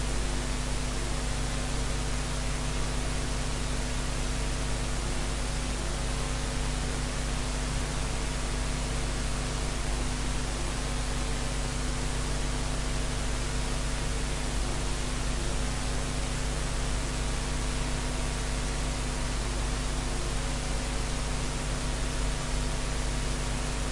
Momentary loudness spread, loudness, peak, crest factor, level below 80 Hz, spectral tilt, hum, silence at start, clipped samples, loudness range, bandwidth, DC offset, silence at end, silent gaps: 0 LU; -32 LUFS; -18 dBFS; 12 dB; -32 dBFS; -4 dB/octave; none; 0 s; under 0.1%; 0 LU; 11.5 kHz; under 0.1%; 0 s; none